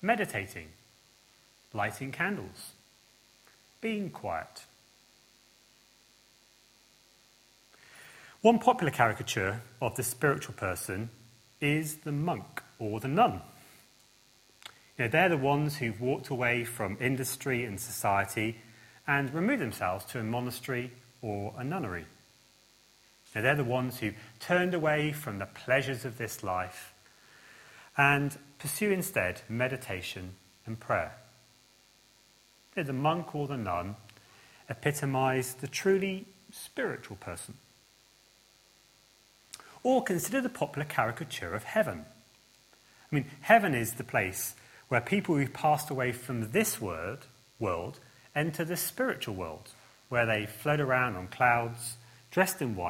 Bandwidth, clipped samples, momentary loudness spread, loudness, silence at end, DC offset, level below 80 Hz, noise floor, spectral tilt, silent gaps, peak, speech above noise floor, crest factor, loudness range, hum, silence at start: 16.5 kHz; under 0.1%; 17 LU; -31 LUFS; 0 s; under 0.1%; -66 dBFS; -63 dBFS; -5 dB/octave; none; -6 dBFS; 32 dB; 26 dB; 8 LU; none; 0 s